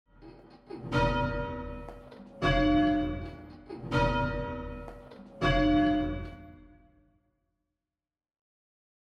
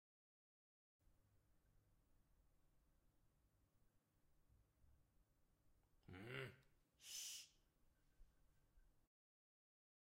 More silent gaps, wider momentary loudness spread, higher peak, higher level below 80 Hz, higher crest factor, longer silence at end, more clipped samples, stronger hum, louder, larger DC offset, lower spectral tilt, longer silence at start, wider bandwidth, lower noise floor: neither; first, 22 LU vs 13 LU; first, -14 dBFS vs -38 dBFS; first, -42 dBFS vs -80 dBFS; second, 18 dB vs 28 dB; first, 2.5 s vs 1.1 s; neither; neither; first, -29 LUFS vs -55 LUFS; neither; first, -7 dB/octave vs -2.5 dB/octave; second, 0.2 s vs 1.05 s; second, 8.2 kHz vs 16 kHz; first, under -90 dBFS vs -81 dBFS